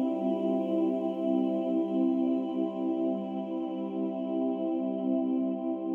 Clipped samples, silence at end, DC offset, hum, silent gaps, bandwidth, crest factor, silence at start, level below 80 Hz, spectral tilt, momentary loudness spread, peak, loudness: under 0.1%; 0 s; under 0.1%; none; none; 3.5 kHz; 12 dB; 0 s; -88 dBFS; -10 dB/octave; 5 LU; -16 dBFS; -30 LUFS